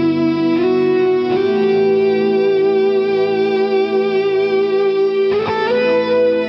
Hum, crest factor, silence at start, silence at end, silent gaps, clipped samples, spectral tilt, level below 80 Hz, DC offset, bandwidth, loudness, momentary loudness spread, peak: none; 8 dB; 0 s; 0 s; none; under 0.1%; -7.5 dB/octave; -60 dBFS; under 0.1%; 5.8 kHz; -15 LUFS; 2 LU; -6 dBFS